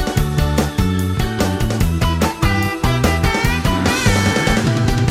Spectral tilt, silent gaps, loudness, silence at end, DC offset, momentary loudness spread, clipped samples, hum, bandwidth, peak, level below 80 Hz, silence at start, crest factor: -5 dB/octave; none; -17 LUFS; 0 s; under 0.1%; 3 LU; under 0.1%; none; 16 kHz; -2 dBFS; -24 dBFS; 0 s; 14 dB